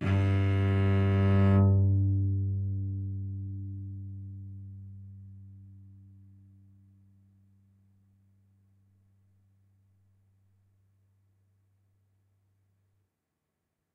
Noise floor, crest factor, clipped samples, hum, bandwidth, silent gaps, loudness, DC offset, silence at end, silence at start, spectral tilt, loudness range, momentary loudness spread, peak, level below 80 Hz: -83 dBFS; 18 dB; under 0.1%; none; 3.9 kHz; none; -28 LUFS; under 0.1%; 8.05 s; 0 s; -10 dB/octave; 24 LU; 25 LU; -14 dBFS; -60 dBFS